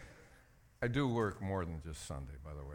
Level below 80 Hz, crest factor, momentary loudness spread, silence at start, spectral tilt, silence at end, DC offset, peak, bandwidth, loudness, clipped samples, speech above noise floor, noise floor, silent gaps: -54 dBFS; 18 dB; 14 LU; 0 s; -6.5 dB/octave; 0 s; under 0.1%; -22 dBFS; 17 kHz; -39 LUFS; under 0.1%; 26 dB; -64 dBFS; none